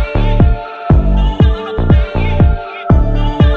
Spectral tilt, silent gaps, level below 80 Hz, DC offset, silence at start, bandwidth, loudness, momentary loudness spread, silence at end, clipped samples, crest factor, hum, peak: -9.5 dB/octave; none; -14 dBFS; under 0.1%; 0 s; 5 kHz; -13 LUFS; 4 LU; 0 s; under 0.1%; 10 dB; none; 0 dBFS